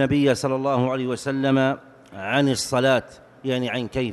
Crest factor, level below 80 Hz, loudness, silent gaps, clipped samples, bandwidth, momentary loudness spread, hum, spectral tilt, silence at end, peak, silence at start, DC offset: 16 dB; -52 dBFS; -22 LUFS; none; under 0.1%; 12 kHz; 10 LU; none; -5.5 dB/octave; 0 s; -8 dBFS; 0 s; under 0.1%